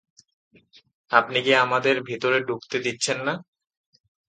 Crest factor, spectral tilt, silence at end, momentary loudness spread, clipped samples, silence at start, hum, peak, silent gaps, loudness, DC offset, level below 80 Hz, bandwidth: 24 dB; -3 dB/octave; 0.9 s; 9 LU; under 0.1%; 1.1 s; none; 0 dBFS; none; -22 LUFS; under 0.1%; -72 dBFS; 9.4 kHz